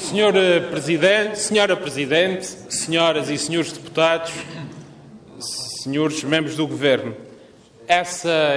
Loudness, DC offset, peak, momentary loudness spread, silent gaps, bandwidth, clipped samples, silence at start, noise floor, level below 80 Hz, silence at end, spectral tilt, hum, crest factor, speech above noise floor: -20 LUFS; under 0.1%; -4 dBFS; 13 LU; none; 11 kHz; under 0.1%; 0 s; -47 dBFS; -62 dBFS; 0 s; -3.5 dB/octave; none; 16 dB; 27 dB